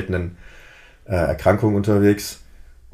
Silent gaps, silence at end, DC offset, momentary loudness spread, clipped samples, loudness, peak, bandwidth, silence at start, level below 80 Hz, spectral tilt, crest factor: none; 0.6 s; under 0.1%; 15 LU; under 0.1%; -19 LUFS; -2 dBFS; 15.5 kHz; 0 s; -40 dBFS; -7 dB/octave; 20 dB